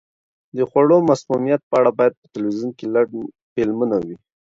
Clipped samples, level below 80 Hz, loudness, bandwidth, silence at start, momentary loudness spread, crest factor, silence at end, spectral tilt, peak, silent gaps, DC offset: under 0.1%; -60 dBFS; -19 LUFS; 7.8 kHz; 0.55 s; 12 LU; 16 dB; 0.35 s; -7.5 dB/octave; -2 dBFS; 1.63-1.71 s, 2.17-2.22 s, 3.42-3.56 s; under 0.1%